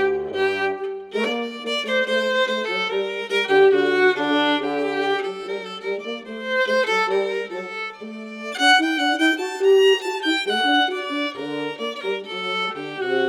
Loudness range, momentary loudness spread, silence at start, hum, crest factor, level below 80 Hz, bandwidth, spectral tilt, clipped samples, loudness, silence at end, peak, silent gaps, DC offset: 4 LU; 13 LU; 0 s; none; 18 dB; -68 dBFS; 13 kHz; -3 dB/octave; under 0.1%; -21 LUFS; 0 s; -4 dBFS; none; under 0.1%